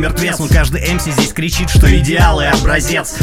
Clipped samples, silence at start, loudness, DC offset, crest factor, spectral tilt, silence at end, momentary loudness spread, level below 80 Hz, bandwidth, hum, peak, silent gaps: under 0.1%; 0 s; -13 LUFS; under 0.1%; 12 dB; -4.5 dB/octave; 0 s; 6 LU; -16 dBFS; 16.5 kHz; none; 0 dBFS; none